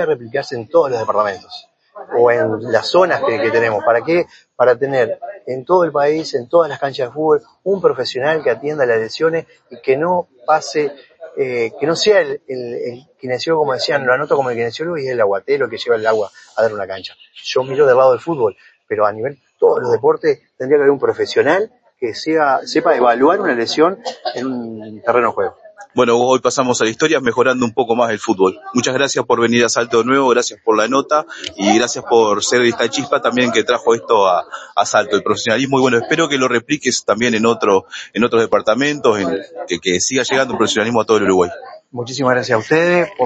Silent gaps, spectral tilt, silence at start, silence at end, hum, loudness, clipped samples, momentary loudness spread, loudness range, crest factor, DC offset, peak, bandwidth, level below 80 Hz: none; -4 dB/octave; 0 s; 0 s; none; -16 LUFS; under 0.1%; 10 LU; 3 LU; 16 dB; under 0.1%; 0 dBFS; 8.6 kHz; -60 dBFS